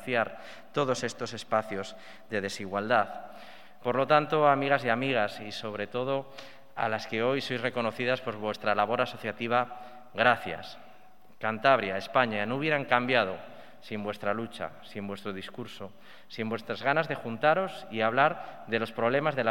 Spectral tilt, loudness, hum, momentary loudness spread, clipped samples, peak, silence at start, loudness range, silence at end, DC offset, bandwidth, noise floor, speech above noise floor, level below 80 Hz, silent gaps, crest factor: -5 dB/octave; -29 LUFS; none; 17 LU; under 0.1%; -6 dBFS; 0 s; 4 LU; 0 s; 0.4%; 17 kHz; -58 dBFS; 29 dB; -74 dBFS; none; 24 dB